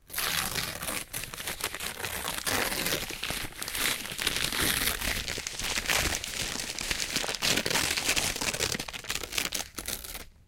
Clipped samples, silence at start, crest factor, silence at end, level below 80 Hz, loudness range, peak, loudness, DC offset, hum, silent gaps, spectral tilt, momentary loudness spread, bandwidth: under 0.1%; 0.1 s; 22 dB; 0.15 s; -46 dBFS; 3 LU; -10 dBFS; -29 LUFS; under 0.1%; none; none; -1 dB/octave; 8 LU; 17 kHz